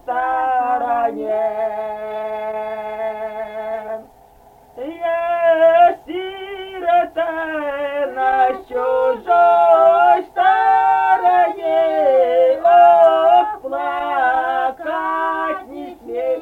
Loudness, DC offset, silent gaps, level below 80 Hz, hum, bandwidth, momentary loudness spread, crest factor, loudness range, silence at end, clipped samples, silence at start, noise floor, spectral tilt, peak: -16 LUFS; under 0.1%; none; -56 dBFS; none; 4.3 kHz; 15 LU; 14 dB; 10 LU; 0 s; under 0.1%; 0.05 s; -47 dBFS; -5 dB/octave; -2 dBFS